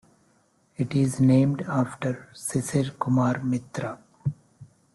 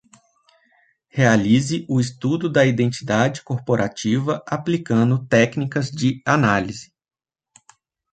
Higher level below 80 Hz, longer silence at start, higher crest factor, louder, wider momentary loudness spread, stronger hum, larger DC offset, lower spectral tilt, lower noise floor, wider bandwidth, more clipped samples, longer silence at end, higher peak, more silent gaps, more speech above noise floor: about the same, -58 dBFS vs -54 dBFS; second, 0.8 s vs 1.15 s; about the same, 16 dB vs 18 dB; second, -26 LUFS vs -20 LUFS; first, 14 LU vs 7 LU; neither; neither; about the same, -7 dB/octave vs -6 dB/octave; about the same, -64 dBFS vs -61 dBFS; first, 12.5 kHz vs 9.2 kHz; neither; second, 0.3 s vs 1.3 s; second, -10 dBFS vs -2 dBFS; neither; about the same, 40 dB vs 42 dB